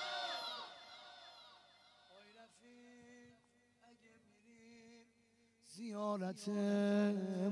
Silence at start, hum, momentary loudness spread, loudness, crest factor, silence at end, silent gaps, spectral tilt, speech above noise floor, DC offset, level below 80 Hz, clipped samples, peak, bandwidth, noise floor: 0 s; 50 Hz at -85 dBFS; 27 LU; -40 LUFS; 18 dB; 0 s; none; -6 dB/octave; 37 dB; under 0.1%; under -90 dBFS; under 0.1%; -24 dBFS; 12 kHz; -74 dBFS